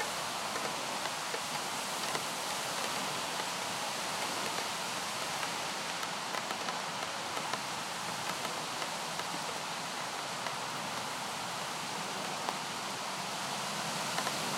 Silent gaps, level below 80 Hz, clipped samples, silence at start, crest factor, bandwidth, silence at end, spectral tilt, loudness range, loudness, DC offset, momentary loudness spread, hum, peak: none; -76 dBFS; under 0.1%; 0 s; 22 dB; 16 kHz; 0 s; -1.5 dB/octave; 2 LU; -35 LUFS; under 0.1%; 3 LU; none; -16 dBFS